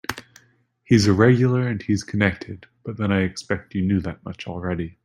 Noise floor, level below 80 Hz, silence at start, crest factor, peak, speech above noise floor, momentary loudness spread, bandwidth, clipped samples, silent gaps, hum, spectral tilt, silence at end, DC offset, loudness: -60 dBFS; -50 dBFS; 0.1 s; 20 dB; -2 dBFS; 39 dB; 19 LU; 15.5 kHz; under 0.1%; none; none; -6.5 dB/octave; 0.15 s; under 0.1%; -21 LUFS